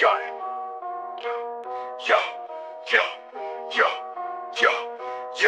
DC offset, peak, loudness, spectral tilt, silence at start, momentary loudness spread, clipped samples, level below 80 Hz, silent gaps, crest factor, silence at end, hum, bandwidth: under 0.1%; -4 dBFS; -26 LUFS; -0.5 dB/octave; 0 s; 12 LU; under 0.1%; -76 dBFS; none; 22 dB; 0 s; none; 10.5 kHz